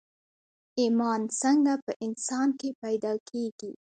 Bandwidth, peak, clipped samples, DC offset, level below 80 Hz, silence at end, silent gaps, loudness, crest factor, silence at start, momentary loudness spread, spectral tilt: 9.4 kHz; -14 dBFS; under 0.1%; under 0.1%; -78 dBFS; 0.25 s; 1.82-1.87 s, 1.96-2.00 s, 2.75-2.82 s, 3.20-3.26 s, 3.52-3.58 s; -28 LUFS; 16 dB; 0.75 s; 11 LU; -4 dB/octave